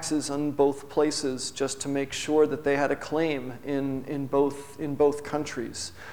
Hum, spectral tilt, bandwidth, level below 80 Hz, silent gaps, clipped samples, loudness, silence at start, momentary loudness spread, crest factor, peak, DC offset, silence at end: none; -4.5 dB/octave; over 20 kHz; -58 dBFS; none; under 0.1%; -28 LUFS; 0 s; 9 LU; 18 dB; -10 dBFS; 0.6%; 0 s